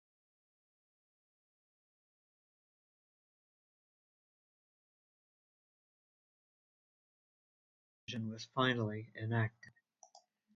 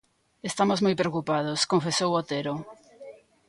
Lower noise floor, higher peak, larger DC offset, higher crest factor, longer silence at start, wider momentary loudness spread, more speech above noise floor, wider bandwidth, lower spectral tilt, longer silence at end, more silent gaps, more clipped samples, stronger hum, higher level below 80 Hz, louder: first, -67 dBFS vs -48 dBFS; second, -20 dBFS vs -10 dBFS; neither; first, 26 dB vs 18 dB; first, 8.1 s vs 0.45 s; about the same, 11 LU vs 12 LU; first, 30 dB vs 22 dB; second, 7.2 kHz vs 11.5 kHz; about the same, -4.5 dB/octave vs -4.5 dB/octave; about the same, 0.4 s vs 0.35 s; neither; neither; neither; second, -78 dBFS vs -66 dBFS; second, -38 LUFS vs -26 LUFS